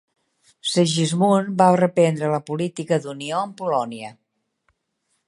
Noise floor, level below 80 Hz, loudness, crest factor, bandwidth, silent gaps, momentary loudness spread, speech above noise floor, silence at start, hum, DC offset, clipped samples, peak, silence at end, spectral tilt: -72 dBFS; -70 dBFS; -21 LUFS; 20 dB; 11.5 kHz; none; 11 LU; 52 dB; 0.65 s; none; under 0.1%; under 0.1%; -2 dBFS; 1.15 s; -5.5 dB/octave